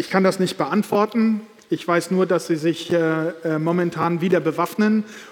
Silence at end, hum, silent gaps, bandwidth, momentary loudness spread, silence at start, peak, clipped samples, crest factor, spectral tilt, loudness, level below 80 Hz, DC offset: 0 s; none; none; 17.5 kHz; 5 LU; 0 s; -2 dBFS; under 0.1%; 18 dB; -6.5 dB/octave; -21 LUFS; -70 dBFS; under 0.1%